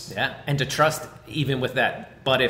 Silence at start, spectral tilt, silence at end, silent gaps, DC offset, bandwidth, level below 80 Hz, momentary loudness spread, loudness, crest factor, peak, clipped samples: 0 s; -4.5 dB/octave; 0 s; none; under 0.1%; 16 kHz; -54 dBFS; 8 LU; -24 LUFS; 16 dB; -8 dBFS; under 0.1%